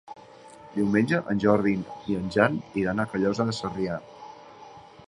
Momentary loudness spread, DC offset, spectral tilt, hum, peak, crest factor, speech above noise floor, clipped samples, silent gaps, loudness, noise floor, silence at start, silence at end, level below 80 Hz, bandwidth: 23 LU; under 0.1%; -7 dB/octave; none; -2 dBFS; 24 dB; 23 dB; under 0.1%; none; -26 LUFS; -48 dBFS; 0.1 s; 0.2 s; -56 dBFS; 11 kHz